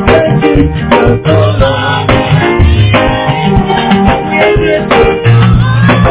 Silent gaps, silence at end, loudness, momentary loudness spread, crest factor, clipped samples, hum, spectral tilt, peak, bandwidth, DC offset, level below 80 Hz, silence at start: none; 0 s; -8 LUFS; 3 LU; 6 dB; 3%; none; -11 dB/octave; 0 dBFS; 4 kHz; under 0.1%; -18 dBFS; 0 s